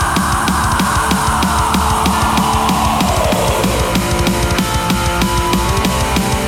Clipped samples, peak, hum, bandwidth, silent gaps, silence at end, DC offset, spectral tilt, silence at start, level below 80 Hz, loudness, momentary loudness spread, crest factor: under 0.1%; -4 dBFS; none; 17.5 kHz; none; 0 s; under 0.1%; -4 dB/octave; 0 s; -22 dBFS; -14 LUFS; 2 LU; 10 dB